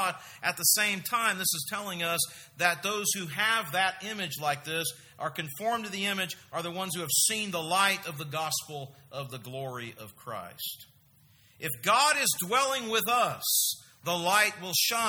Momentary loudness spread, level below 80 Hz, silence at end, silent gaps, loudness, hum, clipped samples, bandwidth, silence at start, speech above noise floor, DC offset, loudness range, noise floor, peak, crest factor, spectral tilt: 14 LU; -74 dBFS; 0 s; none; -28 LUFS; none; under 0.1%; over 20 kHz; 0 s; 31 dB; under 0.1%; 7 LU; -61 dBFS; -8 dBFS; 22 dB; -1.5 dB/octave